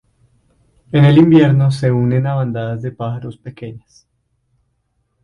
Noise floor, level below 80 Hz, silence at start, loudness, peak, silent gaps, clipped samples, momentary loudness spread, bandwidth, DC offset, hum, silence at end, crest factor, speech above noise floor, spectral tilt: -66 dBFS; -48 dBFS; 0.95 s; -14 LUFS; 0 dBFS; none; under 0.1%; 22 LU; 10.5 kHz; under 0.1%; none; 1.45 s; 16 dB; 53 dB; -9 dB/octave